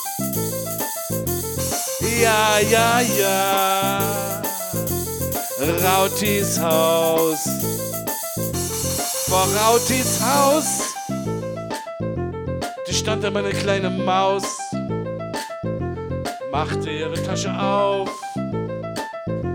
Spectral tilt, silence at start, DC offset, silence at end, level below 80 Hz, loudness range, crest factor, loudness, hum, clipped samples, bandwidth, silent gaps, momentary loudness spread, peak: -3.5 dB/octave; 0 s; under 0.1%; 0 s; -46 dBFS; 6 LU; 20 dB; -21 LUFS; none; under 0.1%; over 20 kHz; none; 11 LU; -2 dBFS